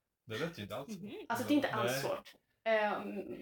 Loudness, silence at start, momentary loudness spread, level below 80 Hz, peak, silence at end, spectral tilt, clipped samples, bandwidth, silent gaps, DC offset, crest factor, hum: -37 LUFS; 0.25 s; 12 LU; -74 dBFS; -20 dBFS; 0 s; -4.5 dB/octave; under 0.1%; 19 kHz; none; under 0.1%; 18 dB; none